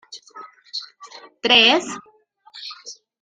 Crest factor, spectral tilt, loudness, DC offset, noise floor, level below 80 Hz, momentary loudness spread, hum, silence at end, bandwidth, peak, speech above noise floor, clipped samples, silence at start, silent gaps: 22 dB; -1.5 dB/octave; -15 LUFS; under 0.1%; -48 dBFS; -68 dBFS; 27 LU; none; 0.3 s; 13.5 kHz; -2 dBFS; 28 dB; under 0.1%; 0.1 s; none